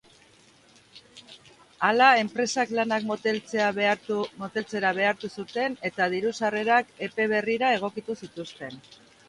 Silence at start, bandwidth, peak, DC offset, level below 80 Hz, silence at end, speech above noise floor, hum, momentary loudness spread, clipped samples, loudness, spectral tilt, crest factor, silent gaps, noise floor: 0.95 s; 11.5 kHz; -4 dBFS; under 0.1%; -72 dBFS; 0.5 s; 31 dB; none; 14 LU; under 0.1%; -25 LUFS; -4 dB/octave; 22 dB; none; -57 dBFS